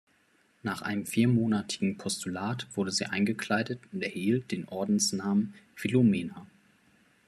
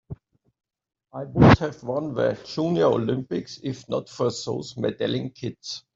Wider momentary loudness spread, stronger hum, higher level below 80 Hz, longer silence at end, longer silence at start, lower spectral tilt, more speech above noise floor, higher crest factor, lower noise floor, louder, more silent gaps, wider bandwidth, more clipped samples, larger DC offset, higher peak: second, 11 LU vs 17 LU; neither; second, -70 dBFS vs -46 dBFS; first, 0.8 s vs 0.15 s; first, 0.65 s vs 0.1 s; second, -5 dB/octave vs -6.5 dB/octave; first, 38 dB vs 19 dB; second, 16 dB vs 22 dB; first, -67 dBFS vs -42 dBFS; second, -30 LUFS vs -24 LUFS; neither; first, 14 kHz vs 7.8 kHz; neither; neither; second, -14 dBFS vs -2 dBFS